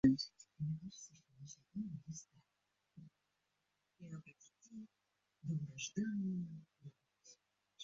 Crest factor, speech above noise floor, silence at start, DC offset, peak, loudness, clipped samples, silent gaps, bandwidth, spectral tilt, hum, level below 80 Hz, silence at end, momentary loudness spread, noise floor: 24 dB; 46 dB; 0.05 s; under 0.1%; -20 dBFS; -45 LUFS; under 0.1%; none; 7.4 kHz; -7 dB/octave; none; -72 dBFS; 0 s; 23 LU; -86 dBFS